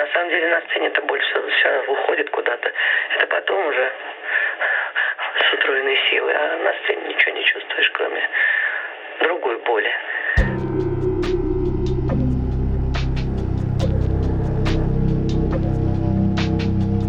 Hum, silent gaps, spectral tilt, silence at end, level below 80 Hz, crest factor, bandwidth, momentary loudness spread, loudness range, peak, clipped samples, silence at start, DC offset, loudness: none; none; -7 dB/octave; 0 s; -28 dBFS; 18 dB; 7.6 kHz; 6 LU; 4 LU; 0 dBFS; under 0.1%; 0 s; under 0.1%; -20 LUFS